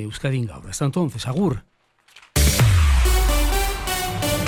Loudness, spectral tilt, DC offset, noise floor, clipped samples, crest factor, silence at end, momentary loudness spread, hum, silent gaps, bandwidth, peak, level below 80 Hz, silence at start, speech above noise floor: -21 LUFS; -4.5 dB/octave; under 0.1%; -53 dBFS; under 0.1%; 14 dB; 0 s; 9 LU; none; none; 16 kHz; -6 dBFS; -24 dBFS; 0 s; 30 dB